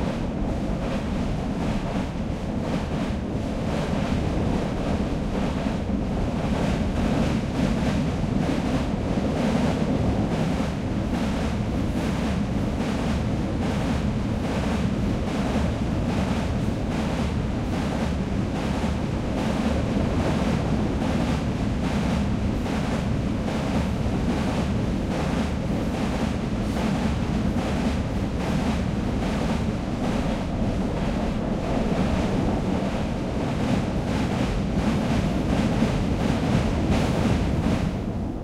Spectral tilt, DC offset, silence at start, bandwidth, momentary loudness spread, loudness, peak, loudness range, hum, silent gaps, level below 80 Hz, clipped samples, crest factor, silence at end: -7 dB/octave; under 0.1%; 0 s; 13.5 kHz; 3 LU; -25 LUFS; -8 dBFS; 2 LU; none; none; -32 dBFS; under 0.1%; 16 dB; 0 s